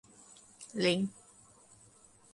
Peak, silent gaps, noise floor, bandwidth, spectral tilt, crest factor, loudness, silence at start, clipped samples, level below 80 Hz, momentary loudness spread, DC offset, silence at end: -16 dBFS; none; -61 dBFS; 11.5 kHz; -4.5 dB/octave; 22 dB; -33 LUFS; 0.6 s; under 0.1%; -74 dBFS; 25 LU; under 0.1%; 1.2 s